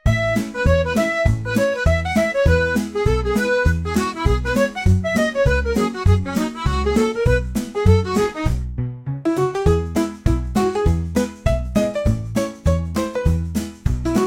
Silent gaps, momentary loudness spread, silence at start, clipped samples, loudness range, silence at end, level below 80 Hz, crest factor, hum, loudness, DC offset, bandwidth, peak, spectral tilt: none; 6 LU; 0.05 s; under 0.1%; 2 LU; 0 s; -26 dBFS; 16 dB; none; -20 LUFS; under 0.1%; 17 kHz; -2 dBFS; -6.5 dB/octave